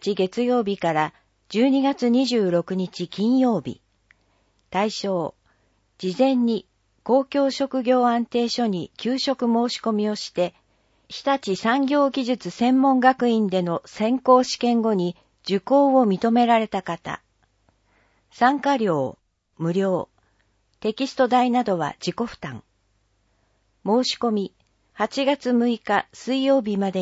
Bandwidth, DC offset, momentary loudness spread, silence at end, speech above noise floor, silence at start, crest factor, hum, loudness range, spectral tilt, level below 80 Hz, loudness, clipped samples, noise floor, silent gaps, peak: 8 kHz; under 0.1%; 11 LU; 0 s; 46 dB; 0 s; 20 dB; none; 6 LU; -5.5 dB/octave; -64 dBFS; -22 LUFS; under 0.1%; -67 dBFS; none; -4 dBFS